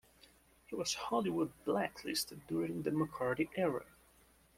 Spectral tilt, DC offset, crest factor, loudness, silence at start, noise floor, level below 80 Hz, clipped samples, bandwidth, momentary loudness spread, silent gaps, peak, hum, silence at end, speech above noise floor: -4.5 dB/octave; under 0.1%; 18 dB; -37 LUFS; 0.7 s; -67 dBFS; -68 dBFS; under 0.1%; 16.5 kHz; 4 LU; none; -20 dBFS; none; 0.75 s; 30 dB